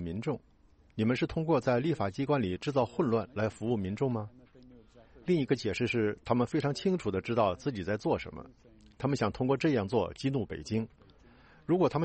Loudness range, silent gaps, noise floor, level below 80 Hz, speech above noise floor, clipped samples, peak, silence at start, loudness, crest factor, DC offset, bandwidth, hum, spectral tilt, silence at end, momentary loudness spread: 2 LU; none; -58 dBFS; -58 dBFS; 28 dB; under 0.1%; -12 dBFS; 0 s; -31 LUFS; 18 dB; under 0.1%; 8.4 kHz; none; -7 dB/octave; 0 s; 8 LU